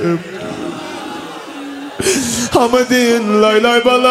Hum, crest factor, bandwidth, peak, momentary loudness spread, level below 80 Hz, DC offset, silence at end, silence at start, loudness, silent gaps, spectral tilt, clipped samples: none; 14 dB; 16 kHz; 0 dBFS; 17 LU; -48 dBFS; under 0.1%; 0 s; 0 s; -13 LUFS; none; -3.5 dB/octave; under 0.1%